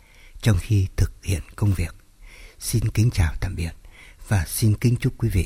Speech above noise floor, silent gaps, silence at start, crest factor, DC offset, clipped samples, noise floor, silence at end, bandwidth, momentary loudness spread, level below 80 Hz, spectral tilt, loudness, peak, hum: 23 dB; none; 0.25 s; 16 dB; under 0.1%; under 0.1%; -45 dBFS; 0 s; 16 kHz; 8 LU; -32 dBFS; -6 dB/octave; -24 LUFS; -6 dBFS; none